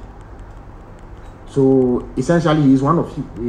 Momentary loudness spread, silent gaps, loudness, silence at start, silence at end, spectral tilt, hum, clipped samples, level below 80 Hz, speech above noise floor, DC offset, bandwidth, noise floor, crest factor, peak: 8 LU; none; -16 LUFS; 0 s; 0 s; -8 dB/octave; none; under 0.1%; -38 dBFS; 22 dB; under 0.1%; 9.6 kHz; -37 dBFS; 16 dB; -2 dBFS